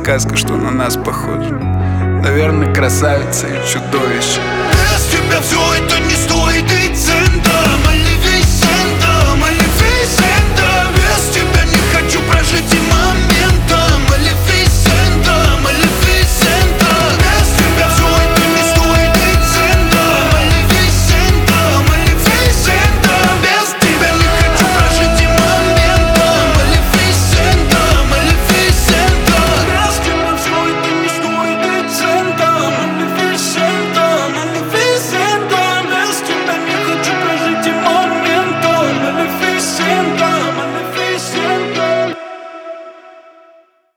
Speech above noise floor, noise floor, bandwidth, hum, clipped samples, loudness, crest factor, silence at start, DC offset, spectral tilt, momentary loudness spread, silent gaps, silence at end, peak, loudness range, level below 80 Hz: 34 dB; -47 dBFS; over 20 kHz; none; under 0.1%; -11 LUFS; 12 dB; 0 s; under 0.1%; -4 dB/octave; 5 LU; none; 0.85 s; 0 dBFS; 4 LU; -18 dBFS